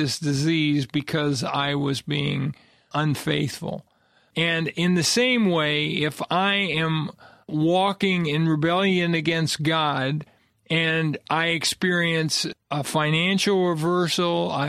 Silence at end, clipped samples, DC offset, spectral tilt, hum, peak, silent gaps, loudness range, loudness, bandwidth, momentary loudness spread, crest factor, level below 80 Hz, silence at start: 0 s; under 0.1%; under 0.1%; -4.5 dB/octave; none; -8 dBFS; none; 4 LU; -23 LUFS; 15 kHz; 7 LU; 16 dB; -60 dBFS; 0 s